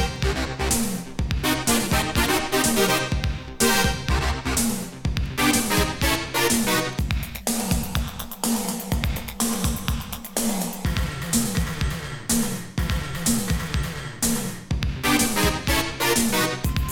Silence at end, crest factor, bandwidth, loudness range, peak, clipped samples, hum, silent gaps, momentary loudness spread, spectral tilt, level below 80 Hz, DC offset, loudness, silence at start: 0 s; 18 dB; 19 kHz; 4 LU; -4 dBFS; under 0.1%; none; none; 8 LU; -3.5 dB/octave; -32 dBFS; under 0.1%; -23 LUFS; 0 s